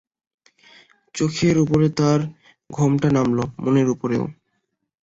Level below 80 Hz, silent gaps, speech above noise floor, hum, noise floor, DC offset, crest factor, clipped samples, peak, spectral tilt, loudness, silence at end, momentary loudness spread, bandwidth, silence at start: -52 dBFS; none; 55 dB; none; -74 dBFS; under 0.1%; 16 dB; under 0.1%; -6 dBFS; -7 dB/octave; -20 LUFS; 0.7 s; 12 LU; 8 kHz; 1.15 s